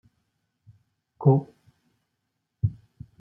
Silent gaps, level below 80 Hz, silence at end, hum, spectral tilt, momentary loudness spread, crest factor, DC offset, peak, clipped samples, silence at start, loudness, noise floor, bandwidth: none; -56 dBFS; 0.5 s; none; -13.5 dB/octave; 26 LU; 24 dB; under 0.1%; -6 dBFS; under 0.1%; 1.2 s; -25 LUFS; -79 dBFS; 1.4 kHz